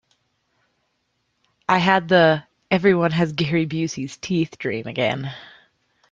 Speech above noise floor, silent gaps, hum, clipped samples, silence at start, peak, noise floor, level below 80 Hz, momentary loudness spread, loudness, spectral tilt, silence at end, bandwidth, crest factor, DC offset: 52 dB; none; none; under 0.1%; 1.7 s; -2 dBFS; -71 dBFS; -58 dBFS; 13 LU; -20 LUFS; -6 dB/octave; 0.65 s; 7.6 kHz; 20 dB; under 0.1%